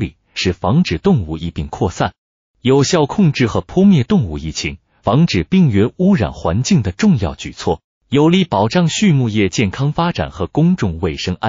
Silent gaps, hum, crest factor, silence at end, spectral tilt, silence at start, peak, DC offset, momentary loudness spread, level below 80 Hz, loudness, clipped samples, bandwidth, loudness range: 2.18-2.54 s, 7.84-8.01 s; none; 12 dB; 0 s; -6 dB/octave; 0 s; -2 dBFS; under 0.1%; 9 LU; -36 dBFS; -16 LUFS; under 0.1%; 7.6 kHz; 2 LU